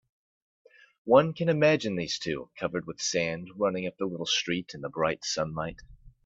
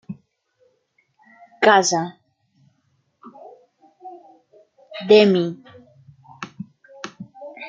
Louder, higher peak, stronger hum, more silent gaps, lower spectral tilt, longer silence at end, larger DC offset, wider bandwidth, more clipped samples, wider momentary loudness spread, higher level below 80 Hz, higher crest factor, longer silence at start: second, -28 LUFS vs -17 LUFS; second, -6 dBFS vs -2 dBFS; neither; neither; about the same, -4 dB/octave vs -4 dB/octave; first, 0.15 s vs 0 s; neither; second, 8 kHz vs 9.2 kHz; neither; second, 11 LU vs 27 LU; first, -60 dBFS vs -70 dBFS; about the same, 24 dB vs 22 dB; first, 1.05 s vs 0.1 s